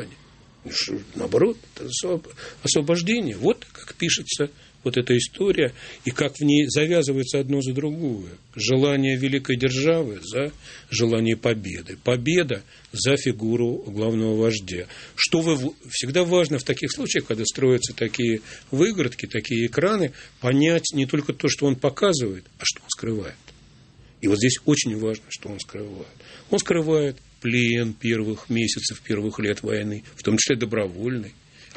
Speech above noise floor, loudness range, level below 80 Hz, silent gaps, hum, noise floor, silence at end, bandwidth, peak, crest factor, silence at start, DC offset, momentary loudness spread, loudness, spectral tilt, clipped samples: 28 dB; 2 LU; -54 dBFS; none; none; -51 dBFS; 0.1 s; 8.8 kHz; -4 dBFS; 20 dB; 0 s; under 0.1%; 11 LU; -23 LUFS; -4.5 dB/octave; under 0.1%